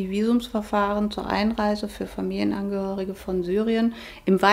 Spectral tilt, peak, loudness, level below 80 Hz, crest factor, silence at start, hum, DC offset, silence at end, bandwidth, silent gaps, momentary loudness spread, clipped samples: -6.5 dB/octave; -4 dBFS; -25 LUFS; -46 dBFS; 20 dB; 0 s; none; under 0.1%; 0 s; 16 kHz; none; 6 LU; under 0.1%